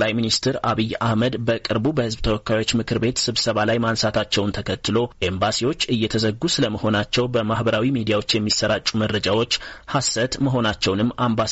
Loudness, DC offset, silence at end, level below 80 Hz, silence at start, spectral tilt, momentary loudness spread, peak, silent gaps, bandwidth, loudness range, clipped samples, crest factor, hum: -21 LUFS; under 0.1%; 0 s; -42 dBFS; 0 s; -4.5 dB/octave; 3 LU; -8 dBFS; none; 8.2 kHz; 1 LU; under 0.1%; 14 dB; none